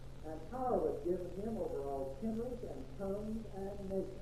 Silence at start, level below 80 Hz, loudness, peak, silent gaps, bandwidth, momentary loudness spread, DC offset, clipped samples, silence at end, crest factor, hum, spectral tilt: 0 s; -52 dBFS; -41 LUFS; -22 dBFS; none; 14 kHz; 10 LU; 0.3%; under 0.1%; 0 s; 18 dB; none; -8 dB/octave